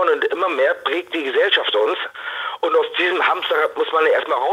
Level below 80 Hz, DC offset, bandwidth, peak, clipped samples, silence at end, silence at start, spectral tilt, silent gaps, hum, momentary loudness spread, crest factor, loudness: -72 dBFS; under 0.1%; 13.5 kHz; -4 dBFS; under 0.1%; 0 s; 0 s; -2 dB/octave; none; none; 7 LU; 16 dB; -19 LUFS